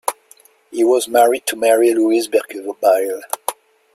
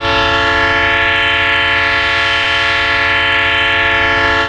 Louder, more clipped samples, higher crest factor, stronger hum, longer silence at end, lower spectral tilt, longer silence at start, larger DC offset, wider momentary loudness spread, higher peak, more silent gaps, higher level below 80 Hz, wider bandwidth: second, -16 LUFS vs -11 LUFS; neither; about the same, 16 dB vs 12 dB; neither; first, 0.4 s vs 0 s; second, -2 dB/octave vs -3.5 dB/octave; about the same, 0.05 s vs 0 s; neither; first, 12 LU vs 1 LU; about the same, 0 dBFS vs -2 dBFS; neither; second, -66 dBFS vs -34 dBFS; first, 16 kHz vs 11 kHz